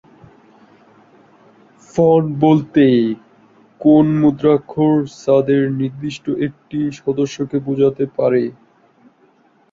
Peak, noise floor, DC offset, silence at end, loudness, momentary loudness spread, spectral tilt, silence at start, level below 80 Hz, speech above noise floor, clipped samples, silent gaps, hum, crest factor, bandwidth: -2 dBFS; -54 dBFS; under 0.1%; 1.2 s; -16 LUFS; 10 LU; -8 dB/octave; 1.95 s; -54 dBFS; 39 dB; under 0.1%; none; none; 16 dB; 7.6 kHz